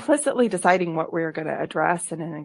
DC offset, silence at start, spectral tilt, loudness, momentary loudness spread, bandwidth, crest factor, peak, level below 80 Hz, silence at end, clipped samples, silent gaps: under 0.1%; 0 s; -5 dB/octave; -23 LUFS; 7 LU; 11.5 kHz; 20 dB; -4 dBFS; -70 dBFS; 0 s; under 0.1%; none